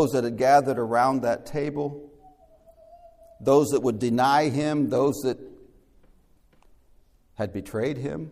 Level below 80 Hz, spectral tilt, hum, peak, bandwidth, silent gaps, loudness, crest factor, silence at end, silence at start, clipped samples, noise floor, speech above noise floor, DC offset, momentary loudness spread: -58 dBFS; -6 dB/octave; none; -6 dBFS; 15.5 kHz; none; -24 LUFS; 18 dB; 0 s; 0 s; under 0.1%; -59 dBFS; 35 dB; under 0.1%; 12 LU